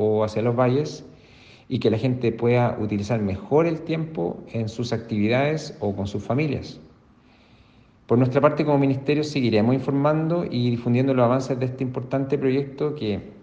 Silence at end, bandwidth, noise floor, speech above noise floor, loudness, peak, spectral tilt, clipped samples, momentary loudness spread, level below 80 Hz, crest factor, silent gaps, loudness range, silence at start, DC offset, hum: 0.05 s; 8 kHz; -54 dBFS; 32 dB; -23 LUFS; -4 dBFS; -7.5 dB/octave; under 0.1%; 9 LU; -58 dBFS; 20 dB; none; 5 LU; 0 s; under 0.1%; none